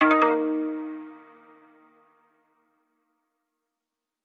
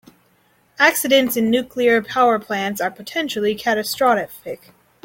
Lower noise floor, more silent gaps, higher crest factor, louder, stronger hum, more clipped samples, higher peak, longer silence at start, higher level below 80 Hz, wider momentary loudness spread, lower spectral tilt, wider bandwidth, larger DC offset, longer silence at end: first, -86 dBFS vs -59 dBFS; neither; about the same, 22 dB vs 18 dB; second, -24 LUFS vs -18 LUFS; neither; neither; second, -6 dBFS vs -2 dBFS; second, 0 s vs 0.8 s; second, -80 dBFS vs -60 dBFS; first, 21 LU vs 9 LU; first, -5.5 dB/octave vs -3 dB/octave; second, 6.4 kHz vs 17 kHz; neither; first, 3.05 s vs 0.5 s